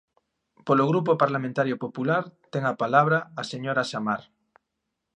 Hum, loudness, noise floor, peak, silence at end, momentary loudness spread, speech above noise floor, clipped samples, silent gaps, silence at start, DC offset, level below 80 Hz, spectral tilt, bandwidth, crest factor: none; -25 LUFS; -81 dBFS; -4 dBFS; 0.95 s; 11 LU; 57 dB; under 0.1%; none; 0.65 s; under 0.1%; -74 dBFS; -6.5 dB/octave; 10 kHz; 22 dB